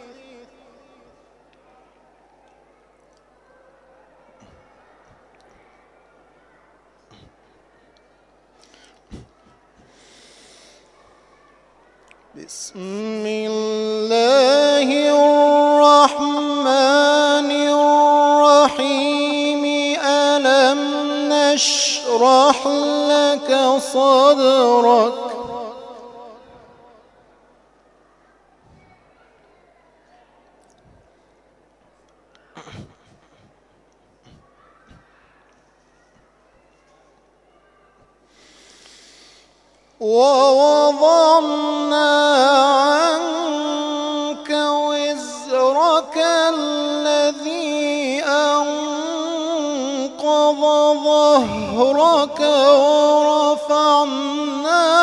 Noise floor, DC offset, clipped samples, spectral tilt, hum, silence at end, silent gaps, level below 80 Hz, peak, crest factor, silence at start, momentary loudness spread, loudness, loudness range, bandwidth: -57 dBFS; under 0.1%; under 0.1%; -2.5 dB/octave; 50 Hz at -65 dBFS; 0 s; none; -62 dBFS; 0 dBFS; 18 dB; 9.1 s; 11 LU; -15 LUFS; 7 LU; 11.5 kHz